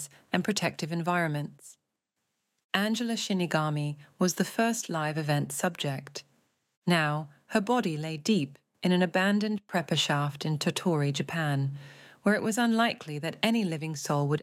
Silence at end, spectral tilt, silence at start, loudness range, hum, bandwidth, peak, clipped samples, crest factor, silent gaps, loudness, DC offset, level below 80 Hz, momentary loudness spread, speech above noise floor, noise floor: 0 s; -5 dB/octave; 0 s; 3 LU; none; 16 kHz; -8 dBFS; under 0.1%; 20 dB; 2.64-2.69 s, 6.77-6.82 s; -29 LUFS; under 0.1%; -76 dBFS; 8 LU; 54 dB; -83 dBFS